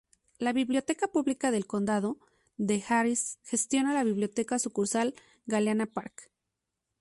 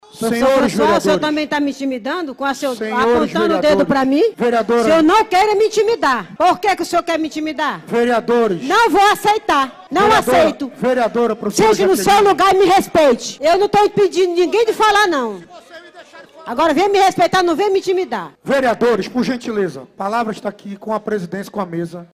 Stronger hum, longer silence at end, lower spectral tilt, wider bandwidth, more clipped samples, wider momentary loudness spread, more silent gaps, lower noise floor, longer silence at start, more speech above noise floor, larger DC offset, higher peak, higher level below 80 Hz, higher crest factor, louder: neither; first, 0.75 s vs 0.1 s; about the same, -4 dB/octave vs -4 dB/octave; second, 11.5 kHz vs 16 kHz; neither; second, 8 LU vs 11 LU; neither; first, -85 dBFS vs -40 dBFS; first, 0.4 s vs 0.15 s; first, 56 dB vs 25 dB; neither; second, -14 dBFS vs -4 dBFS; second, -70 dBFS vs -48 dBFS; first, 16 dB vs 10 dB; second, -30 LUFS vs -15 LUFS